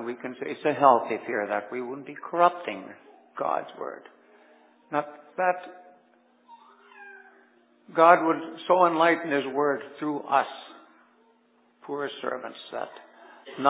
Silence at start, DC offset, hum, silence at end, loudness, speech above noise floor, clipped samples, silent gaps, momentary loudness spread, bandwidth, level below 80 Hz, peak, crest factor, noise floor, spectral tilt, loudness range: 0 s; under 0.1%; none; 0 s; -26 LUFS; 38 dB; under 0.1%; none; 21 LU; 4 kHz; -88 dBFS; -4 dBFS; 24 dB; -64 dBFS; -8.5 dB/octave; 11 LU